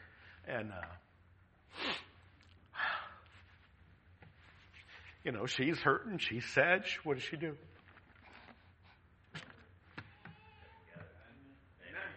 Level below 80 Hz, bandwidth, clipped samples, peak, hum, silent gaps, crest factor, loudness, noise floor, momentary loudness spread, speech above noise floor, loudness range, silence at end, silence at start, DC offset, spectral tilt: -70 dBFS; 8.2 kHz; under 0.1%; -14 dBFS; none; none; 28 dB; -37 LUFS; -66 dBFS; 27 LU; 30 dB; 21 LU; 0 s; 0 s; under 0.1%; -4.5 dB/octave